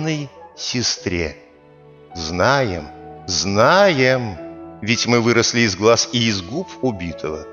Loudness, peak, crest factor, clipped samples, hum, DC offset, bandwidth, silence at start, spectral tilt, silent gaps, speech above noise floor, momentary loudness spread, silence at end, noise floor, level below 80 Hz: -18 LUFS; -2 dBFS; 18 dB; under 0.1%; none; under 0.1%; 15.5 kHz; 0 s; -4 dB/octave; none; 28 dB; 16 LU; 0 s; -46 dBFS; -46 dBFS